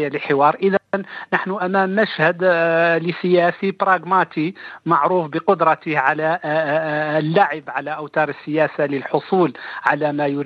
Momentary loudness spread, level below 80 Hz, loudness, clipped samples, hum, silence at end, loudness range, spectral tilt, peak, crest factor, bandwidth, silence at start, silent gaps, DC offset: 7 LU; -70 dBFS; -19 LUFS; under 0.1%; none; 0 s; 2 LU; -8 dB/octave; 0 dBFS; 18 dB; 6.8 kHz; 0 s; none; under 0.1%